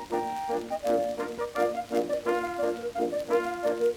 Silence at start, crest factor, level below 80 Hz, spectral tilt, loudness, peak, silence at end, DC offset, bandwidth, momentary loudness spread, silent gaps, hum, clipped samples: 0 s; 16 dB; -62 dBFS; -4.5 dB/octave; -29 LUFS; -14 dBFS; 0 s; under 0.1%; 19 kHz; 4 LU; none; none; under 0.1%